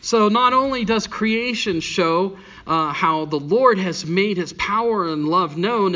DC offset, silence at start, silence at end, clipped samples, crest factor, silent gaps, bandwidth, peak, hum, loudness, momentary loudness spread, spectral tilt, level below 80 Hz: under 0.1%; 0.05 s; 0 s; under 0.1%; 18 dB; none; 7.6 kHz; -2 dBFS; none; -19 LUFS; 6 LU; -5 dB/octave; -52 dBFS